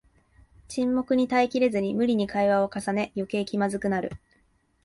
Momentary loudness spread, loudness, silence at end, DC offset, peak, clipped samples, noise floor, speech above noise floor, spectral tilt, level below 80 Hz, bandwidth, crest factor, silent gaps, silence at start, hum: 7 LU; -26 LUFS; 0.65 s; under 0.1%; -10 dBFS; under 0.1%; -66 dBFS; 41 dB; -6 dB/octave; -58 dBFS; 11.5 kHz; 16 dB; none; 0.7 s; none